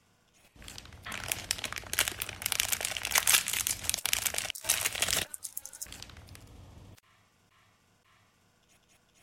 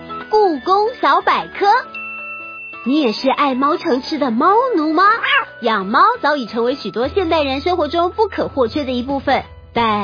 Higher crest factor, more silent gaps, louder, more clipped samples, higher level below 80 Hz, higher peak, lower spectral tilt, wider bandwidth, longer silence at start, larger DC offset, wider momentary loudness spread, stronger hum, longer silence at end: first, 32 dB vs 14 dB; neither; second, -30 LUFS vs -16 LUFS; neither; second, -58 dBFS vs -46 dBFS; about the same, -4 dBFS vs -2 dBFS; second, 0.5 dB/octave vs -5.5 dB/octave; first, 17 kHz vs 5.4 kHz; first, 0.55 s vs 0 s; neither; first, 22 LU vs 8 LU; neither; first, 2.3 s vs 0 s